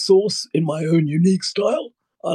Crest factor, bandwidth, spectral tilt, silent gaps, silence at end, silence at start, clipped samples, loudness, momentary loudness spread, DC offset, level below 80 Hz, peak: 16 dB; 12 kHz; -6 dB/octave; none; 0 s; 0 s; under 0.1%; -19 LUFS; 10 LU; under 0.1%; -76 dBFS; -4 dBFS